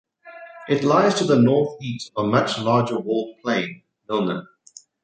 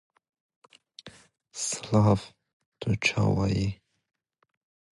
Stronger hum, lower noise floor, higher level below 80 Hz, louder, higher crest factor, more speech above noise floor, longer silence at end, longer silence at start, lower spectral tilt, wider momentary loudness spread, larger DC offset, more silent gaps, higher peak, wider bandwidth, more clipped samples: neither; about the same, -50 dBFS vs -51 dBFS; second, -62 dBFS vs -50 dBFS; first, -21 LUFS vs -27 LUFS; about the same, 18 dB vs 22 dB; about the same, 29 dB vs 26 dB; second, 0.6 s vs 1.2 s; second, 0.25 s vs 1.05 s; about the same, -6 dB/octave vs -5 dB/octave; second, 15 LU vs 25 LU; neither; second, none vs 2.53-2.60 s, 2.66-2.72 s; first, -4 dBFS vs -8 dBFS; second, 9.2 kHz vs 11.5 kHz; neither